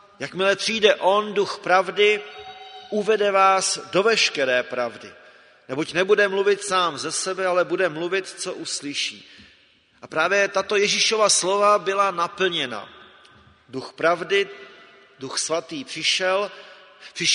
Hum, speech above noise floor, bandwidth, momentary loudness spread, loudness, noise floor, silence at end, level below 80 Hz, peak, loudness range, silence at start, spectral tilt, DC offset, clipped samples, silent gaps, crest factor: none; 36 dB; 11 kHz; 15 LU; -21 LUFS; -57 dBFS; 0 s; -70 dBFS; -2 dBFS; 6 LU; 0.2 s; -2 dB/octave; under 0.1%; under 0.1%; none; 20 dB